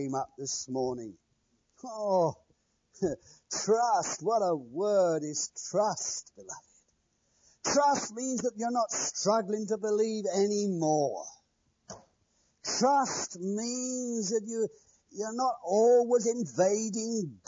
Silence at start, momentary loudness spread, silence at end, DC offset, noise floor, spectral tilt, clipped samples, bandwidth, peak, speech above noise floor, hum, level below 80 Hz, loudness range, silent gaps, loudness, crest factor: 0 s; 15 LU; 0.1 s; under 0.1%; -74 dBFS; -4 dB/octave; under 0.1%; 7.8 kHz; -14 dBFS; 44 dB; none; -72 dBFS; 3 LU; none; -30 LUFS; 16 dB